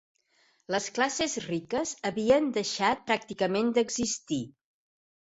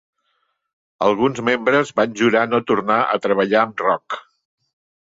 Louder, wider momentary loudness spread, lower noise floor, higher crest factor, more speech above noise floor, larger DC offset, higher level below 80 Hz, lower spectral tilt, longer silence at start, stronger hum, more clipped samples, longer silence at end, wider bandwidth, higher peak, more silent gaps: second, -29 LUFS vs -18 LUFS; first, 8 LU vs 4 LU; about the same, -68 dBFS vs -69 dBFS; about the same, 20 dB vs 18 dB; second, 40 dB vs 51 dB; neither; about the same, -62 dBFS vs -62 dBFS; second, -3.5 dB/octave vs -5.5 dB/octave; second, 0.7 s vs 1 s; neither; neither; about the same, 0.75 s vs 0.85 s; about the same, 8.2 kHz vs 7.8 kHz; second, -10 dBFS vs -2 dBFS; neither